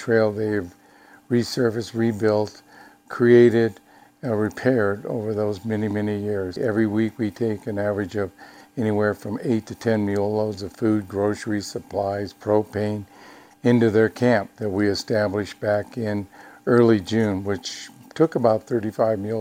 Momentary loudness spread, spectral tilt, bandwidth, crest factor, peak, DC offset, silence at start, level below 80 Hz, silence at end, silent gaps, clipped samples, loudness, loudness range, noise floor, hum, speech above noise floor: 10 LU; -7 dB/octave; 16 kHz; 20 dB; -2 dBFS; under 0.1%; 0 s; -60 dBFS; 0 s; none; under 0.1%; -23 LUFS; 4 LU; -51 dBFS; none; 29 dB